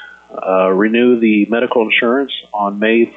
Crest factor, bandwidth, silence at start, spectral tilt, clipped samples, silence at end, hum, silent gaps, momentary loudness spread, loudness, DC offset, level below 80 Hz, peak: 10 dB; 3.9 kHz; 0 s; -8 dB/octave; under 0.1%; 0.05 s; none; none; 8 LU; -14 LUFS; under 0.1%; -62 dBFS; -2 dBFS